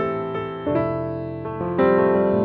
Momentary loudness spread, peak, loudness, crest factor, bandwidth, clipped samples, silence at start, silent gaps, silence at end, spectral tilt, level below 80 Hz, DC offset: 11 LU; -6 dBFS; -22 LUFS; 14 dB; 4.7 kHz; under 0.1%; 0 s; none; 0 s; -10.5 dB/octave; -50 dBFS; under 0.1%